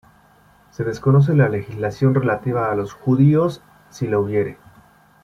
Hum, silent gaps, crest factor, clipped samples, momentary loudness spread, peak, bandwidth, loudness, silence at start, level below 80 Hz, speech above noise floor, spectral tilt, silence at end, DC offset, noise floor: none; none; 16 dB; under 0.1%; 13 LU; -4 dBFS; 6.8 kHz; -19 LUFS; 0.8 s; -52 dBFS; 35 dB; -9 dB/octave; 0.7 s; under 0.1%; -53 dBFS